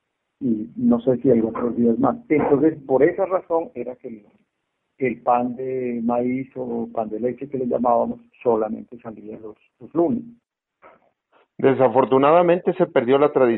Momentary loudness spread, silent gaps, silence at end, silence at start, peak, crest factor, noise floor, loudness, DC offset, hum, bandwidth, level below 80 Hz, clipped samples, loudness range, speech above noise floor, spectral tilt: 15 LU; none; 0 s; 0.4 s; -4 dBFS; 18 dB; -76 dBFS; -21 LUFS; under 0.1%; none; 4.1 kHz; -60 dBFS; under 0.1%; 6 LU; 55 dB; -11.5 dB/octave